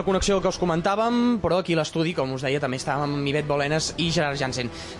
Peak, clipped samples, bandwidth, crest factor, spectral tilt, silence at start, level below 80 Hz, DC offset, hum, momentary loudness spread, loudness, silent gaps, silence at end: -10 dBFS; under 0.1%; 11.5 kHz; 12 dB; -5 dB/octave; 0 s; -44 dBFS; under 0.1%; none; 4 LU; -24 LUFS; none; 0 s